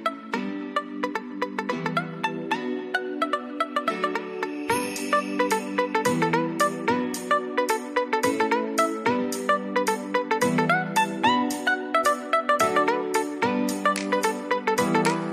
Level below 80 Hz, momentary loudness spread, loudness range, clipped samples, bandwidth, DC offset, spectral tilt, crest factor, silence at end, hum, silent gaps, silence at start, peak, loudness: -70 dBFS; 7 LU; 5 LU; under 0.1%; 14.5 kHz; under 0.1%; -4 dB/octave; 16 dB; 0 s; none; none; 0 s; -8 dBFS; -25 LUFS